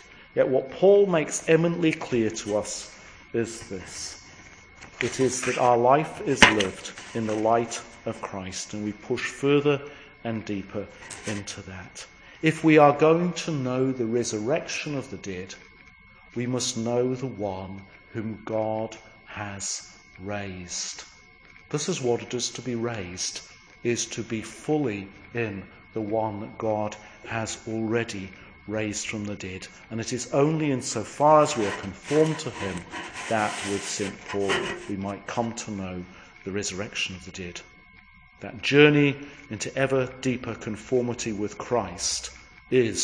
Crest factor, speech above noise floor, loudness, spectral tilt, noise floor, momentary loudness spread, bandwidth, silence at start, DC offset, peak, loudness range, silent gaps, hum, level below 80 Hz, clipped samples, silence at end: 26 dB; 27 dB; -26 LUFS; -4.5 dB/octave; -52 dBFS; 18 LU; 10.5 kHz; 0.1 s; under 0.1%; 0 dBFS; 8 LU; none; none; -56 dBFS; under 0.1%; 0 s